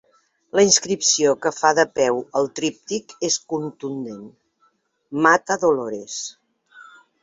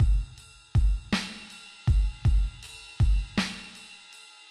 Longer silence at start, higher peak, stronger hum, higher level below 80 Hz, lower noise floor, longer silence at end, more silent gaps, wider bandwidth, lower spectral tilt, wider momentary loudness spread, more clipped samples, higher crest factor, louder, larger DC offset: first, 0.55 s vs 0 s; first, -2 dBFS vs -14 dBFS; neither; second, -66 dBFS vs -28 dBFS; first, -64 dBFS vs -50 dBFS; second, 0.4 s vs 0.55 s; neither; second, 8.4 kHz vs 11.5 kHz; second, -2 dB/octave vs -5.5 dB/octave; second, 14 LU vs 18 LU; neither; first, 20 dB vs 14 dB; first, -20 LUFS vs -29 LUFS; neither